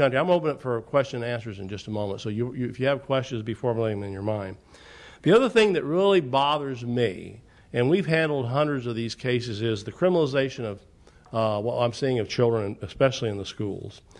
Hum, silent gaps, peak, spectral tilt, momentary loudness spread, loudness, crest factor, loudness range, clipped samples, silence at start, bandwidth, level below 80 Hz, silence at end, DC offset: none; none; -8 dBFS; -6.5 dB/octave; 12 LU; -25 LUFS; 18 dB; 5 LU; under 0.1%; 0 s; 11 kHz; -58 dBFS; 0.2 s; under 0.1%